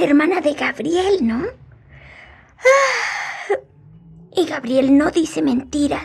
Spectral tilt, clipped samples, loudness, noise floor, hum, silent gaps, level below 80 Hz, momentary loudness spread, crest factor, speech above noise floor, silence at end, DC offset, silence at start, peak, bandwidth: -4 dB/octave; under 0.1%; -18 LUFS; -45 dBFS; none; none; -50 dBFS; 10 LU; 16 dB; 28 dB; 0 s; under 0.1%; 0 s; -2 dBFS; 12.5 kHz